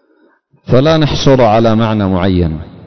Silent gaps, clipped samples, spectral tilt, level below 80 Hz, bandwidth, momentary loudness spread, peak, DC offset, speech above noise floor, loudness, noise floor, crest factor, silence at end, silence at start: none; under 0.1%; -7 dB/octave; -28 dBFS; 6.4 kHz; 5 LU; 0 dBFS; under 0.1%; 42 dB; -11 LUFS; -52 dBFS; 12 dB; 0 s; 0.65 s